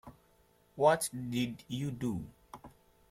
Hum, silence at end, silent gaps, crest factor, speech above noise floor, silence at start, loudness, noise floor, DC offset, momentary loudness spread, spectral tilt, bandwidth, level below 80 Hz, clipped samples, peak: none; 0.4 s; none; 22 dB; 35 dB; 0.05 s; -33 LUFS; -67 dBFS; under 0.1%; 25 LU; -5 dB/octave; 16.5 kHz; -64 dBFS; under 0.1%; -12 dBFS